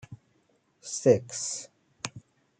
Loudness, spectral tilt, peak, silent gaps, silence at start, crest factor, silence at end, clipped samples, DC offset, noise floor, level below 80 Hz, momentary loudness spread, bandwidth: -29 LUFS; -4.5 dB/octave; -8 dBFS; none; 0.1 s; 24 dB; 0.4 s; under 0.1%; under 0.1%; -69 dBFS; -72 dBFS; 24 LU; 9.4 kHz